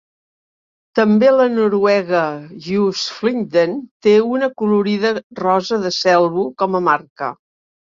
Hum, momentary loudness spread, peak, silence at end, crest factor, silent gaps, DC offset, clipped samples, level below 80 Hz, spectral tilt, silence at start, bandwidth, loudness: none; 9 LU; -2 dBFS; 0.6 s; 16 dB; 3.91-4.00 s, 5.24-5.30 s, 7.10-7.16 s; under 0.1%; under 0.1%; -62 dBFS; -5.5 dB/octave; 0.95 s; 7.6 kHz; -16 LUFS